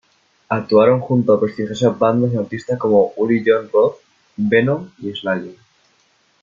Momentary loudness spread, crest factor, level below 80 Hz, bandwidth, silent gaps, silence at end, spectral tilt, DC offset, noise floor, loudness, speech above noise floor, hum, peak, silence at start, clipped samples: 10 LU; 16 dB; -58 dBFS; 7.4 kHz; none; 0.9 s; -7.5 dB/octave; under 0.1%; -59 dBFS; -17 LUFS; 43 dB; none; -2 dBFS; 0.5 s; under 0.1%